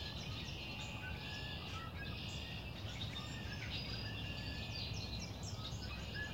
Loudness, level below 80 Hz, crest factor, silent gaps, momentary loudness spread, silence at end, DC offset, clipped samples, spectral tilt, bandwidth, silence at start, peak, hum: -45 LUFS; -54 dBFS; 14 dB; none; 3 LU; 0 s; under 0.1%; under 0.1%; -4.5 dB/octave; 16 kHz; 0 s; -30 dBFS; none